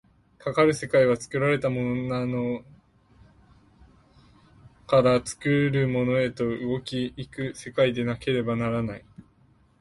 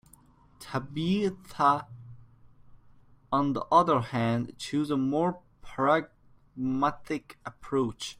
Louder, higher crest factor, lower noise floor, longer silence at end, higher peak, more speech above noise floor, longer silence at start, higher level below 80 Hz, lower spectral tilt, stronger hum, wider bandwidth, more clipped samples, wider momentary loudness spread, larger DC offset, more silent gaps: first, -25 LUFS vs -28 LUFS; about the same, 18 dB vs 22 dB; about the same, -60 dBFS vs -58 dBFS; first, 0.6 s vs 0.05 s; about the same, -8 dBFS vs -8 dBFS; first, 36 dB vs 31 dB; second, 0.45 s vs 0.6 s; about the same, -56 dBFS vs -60 dBFS; about the same, -6.5 dB/octave vs -6.5 dB/octave; neither; second, 11.5 kHz vs 15.5 kHz; neither; second, 12 LU vs 20 LU; neither; neither